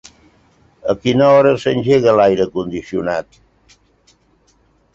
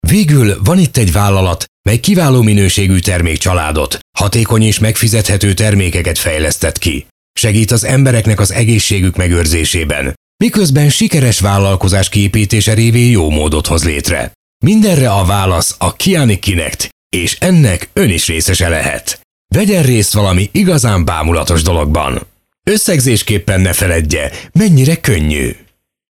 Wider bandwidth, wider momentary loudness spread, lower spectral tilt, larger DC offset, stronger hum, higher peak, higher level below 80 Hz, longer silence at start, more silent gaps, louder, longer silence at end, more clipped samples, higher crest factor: second, 7.8 kHz vs 17 kHz; first, 12 LU vs 7 LU; first, -6.5 dB/octave vs -5 dB/octave; neither; neither; about the same, -2 dBFS vs 0 dBFS; second, -50 dBFS vs -24 dBFS; first, 0.85 s vs 0.05 s; second, none vs 1.68-1.84 s, 4.01-4.13 s, 7.11-7.34 s, 10.17-10.39 s, 14.35-14.60 s, 16.92-17.10 s, 19.25-19.45 s; second, -15 LUFS vs -11 LUFS; first, 1.75 s vs 0.55 s; neither; first, 16 dB vs 10 dB